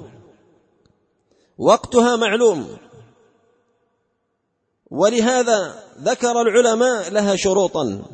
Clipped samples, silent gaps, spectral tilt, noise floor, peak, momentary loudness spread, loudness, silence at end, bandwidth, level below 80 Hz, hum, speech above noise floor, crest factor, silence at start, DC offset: under 0.1%; none; -3.5 dB/octave; -72 dBFS; -2 dBFS; 10 LU; -17 LUFS; 0 s; 8.8 kHz; -56 dBFS; none; 55 dB; 18 dB; 0 s; under 0.1%